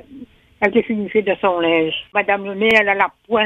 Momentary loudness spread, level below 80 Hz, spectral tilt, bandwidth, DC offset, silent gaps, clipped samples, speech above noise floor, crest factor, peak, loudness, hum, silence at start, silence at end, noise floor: 6 LU; -56 dBFS; -5.5 dB/octave; 9.4 kHz; under 0.1%; none; under 0.1%; 23 dB; 18 dB; 0 dBFS; -17 LUFS; none; 0.1 s; 0 s; -40 dBFS